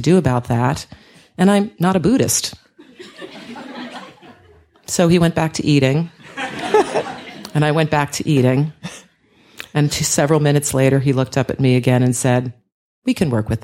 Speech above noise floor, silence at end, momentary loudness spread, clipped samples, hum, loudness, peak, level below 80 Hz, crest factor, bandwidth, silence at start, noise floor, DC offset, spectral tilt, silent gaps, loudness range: 37 dB; 0.05 s; 18 LU; under 0.1%; none; -17 LUFS; -2 dBFS; -46 dBFS; 16 dB; 16.5 kHz; 0 s; -53 dBFS; under 0.1%; -5.5 dB/octave; 12.72-13.02 s; 5 LU